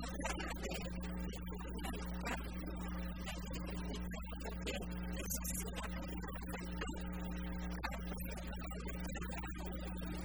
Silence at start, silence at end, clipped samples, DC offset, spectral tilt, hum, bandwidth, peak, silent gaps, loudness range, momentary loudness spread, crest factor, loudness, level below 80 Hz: 0 s; 0 s; under 0.1%; 0.1%; -4.5 dB/octave; none; over 20 kHz; -26 dBFS; none; 1 LU; 4 LU; 16 dB; -44 LUFS; -46 dBFS